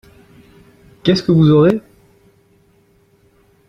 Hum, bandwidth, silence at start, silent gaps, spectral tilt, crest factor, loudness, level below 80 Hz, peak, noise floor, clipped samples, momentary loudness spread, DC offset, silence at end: none; 7 kHz; 1.05 s; none; -8 dB/octave; 18 dB; -13 LUFS; -50 dBFS; 0 dBFS; -54 dBFS; under 0.1%; 10 LU; under 0.1%; 1.9 s